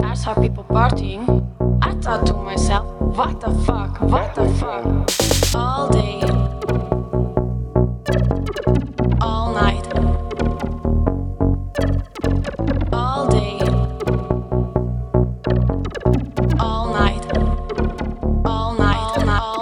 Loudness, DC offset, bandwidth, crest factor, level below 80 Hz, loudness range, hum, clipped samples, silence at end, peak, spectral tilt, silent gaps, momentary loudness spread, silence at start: -20 LUFS; under 0.1%; 17.5 kHz; 18 dB; -24 dBFS; 2 LU; none; under 0.1%; 0 s; 0 dBFS; -6 dB/octave; none; 4 LU; 0 s